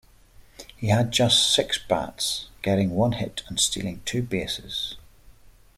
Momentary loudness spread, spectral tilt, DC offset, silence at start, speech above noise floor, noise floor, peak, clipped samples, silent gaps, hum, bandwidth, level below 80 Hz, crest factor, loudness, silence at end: 12 LU; -3.5 dB/octave; under 0.1%; 0.6 s; 28 dB; -52 dBFS; -6 dBFS; under 0.1%; none; none; 16 kHz; -50 dBFS; 20 dB; -24 LUFS; 0.45 s